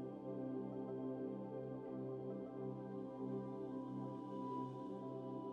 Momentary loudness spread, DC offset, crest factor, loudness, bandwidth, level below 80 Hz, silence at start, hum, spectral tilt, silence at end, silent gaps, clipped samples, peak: 3 LU; under 0.1%; 14 dB; -47 LUFS; 6.6 kHz; -82 dBFS; 0 s; none; -10 dB/octave; 0 s; none; under 0.1%; -34 dBFS